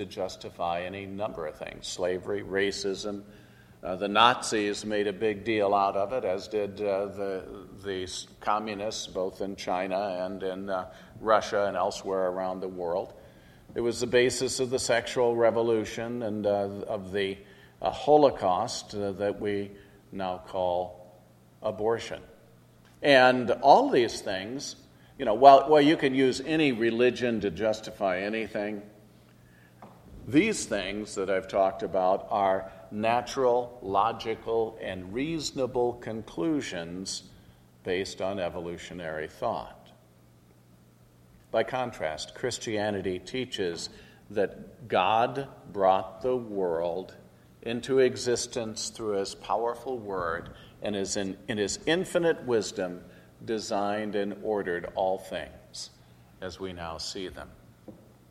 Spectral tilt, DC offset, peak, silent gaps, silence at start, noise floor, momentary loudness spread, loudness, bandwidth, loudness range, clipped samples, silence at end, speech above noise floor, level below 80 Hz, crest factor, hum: -4 dB/octave; under 0.1%; -2 dBFS; none; 0 s; -58 dBFS; 14 LU; -28 LUFS; 14.5 kHz; 11 LU; under 0.1%; 0.35 s; 30 dB; -60 dBFS; 26 dB; none